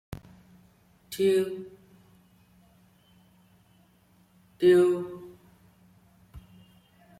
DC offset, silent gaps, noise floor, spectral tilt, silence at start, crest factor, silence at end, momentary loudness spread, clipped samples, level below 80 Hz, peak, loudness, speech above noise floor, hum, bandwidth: under 0.1%; none; -62 dBFS; -6 dB/octave; 1.1 s; 20 dB; 0.8 s; 25 LU; under 0.1%; -62 dBFS; -12 dBFS; -25 LUFS; 39 dB; none; 15 kHz